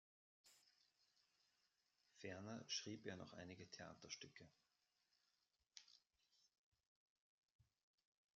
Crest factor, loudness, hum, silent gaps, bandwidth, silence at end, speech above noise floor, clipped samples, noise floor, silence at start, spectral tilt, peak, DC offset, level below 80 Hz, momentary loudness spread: 26 dB; -55 LUFS; none; 6.58-6.72 s, 6.86-7.59 s; 7.4 kHz; 0.75 s; 33 dB; under 0.1%; -89 dBFS; 0.45 s; -3 dB/octave; -36 dBFS; under 0.1%; under -90 dBFS; 16 LU